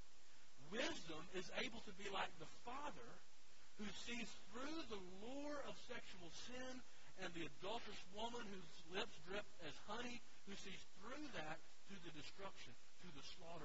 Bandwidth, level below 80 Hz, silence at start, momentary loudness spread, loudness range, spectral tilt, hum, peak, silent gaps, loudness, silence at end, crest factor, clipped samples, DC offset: 7.6 kHz; -74 dBFS; 0 s; 13 LU; 4 LU; -2 dB/octave; none; -32 dBFS; none; -53 LUFS; 0 s; 22 dB; under 0.1%; 0.4%